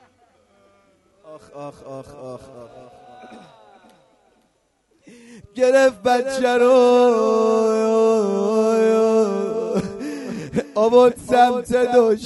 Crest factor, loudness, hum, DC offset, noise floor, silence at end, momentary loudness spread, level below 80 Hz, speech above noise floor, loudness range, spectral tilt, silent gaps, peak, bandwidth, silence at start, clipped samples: 18 dB; -17 LUFS; none; under 0.1%; -65 dBFS; 0 s; 22 LU; -56 dBFS; 47 dB; 23 LU; -5 dB/octave; none; -2 dBFS; 11.5 kHz; 1.3 s; under 0.1%